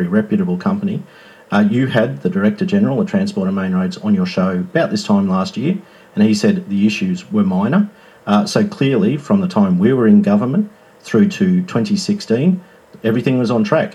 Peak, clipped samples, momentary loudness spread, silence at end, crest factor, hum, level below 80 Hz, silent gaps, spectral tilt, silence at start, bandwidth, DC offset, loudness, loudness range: 0 dBFS; under 0.1%; 7 LU; 0.05 s; 16 dB; none; -62 dBFS; none; -7 dB/octave; 0 s; 11 kHz; under 0.1%; -16 LUFS; 2 LU